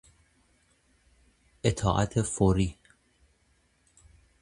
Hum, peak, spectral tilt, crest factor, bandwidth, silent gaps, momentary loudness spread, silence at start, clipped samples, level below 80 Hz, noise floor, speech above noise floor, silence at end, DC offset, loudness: none; -10 dBFS; -6 dB/octave; 22 dB; 11 kHz; none; 5 LU; 1.65 s; under 0.1%; -44 dBFS; -68 dBFS; 42 dB; 1.7 s; under 0.1%; -27 LUFS